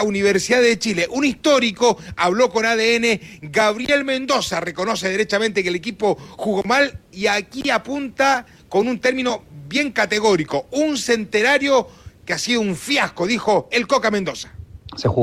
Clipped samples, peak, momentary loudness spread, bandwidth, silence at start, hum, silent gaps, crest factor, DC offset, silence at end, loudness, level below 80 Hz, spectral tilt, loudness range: under 0.1%; -4 dBFS; 7 LU; 15.5 kHz; 0 s; none; none; 14 dB; under 0.1%; 0 s; -19 LUFS; -52 dBFS; -3.5 dB/octave; 3 LU